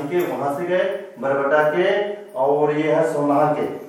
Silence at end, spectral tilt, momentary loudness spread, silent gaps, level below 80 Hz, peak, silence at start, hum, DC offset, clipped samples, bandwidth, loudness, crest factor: 0 s; -6.5 dB/octave; 6 LU; none; -76 dBFS; -4 dBFS; 0 s; none; under 0.1%; under 0.1%; 16 kHz; -20 LUFS; 14 dB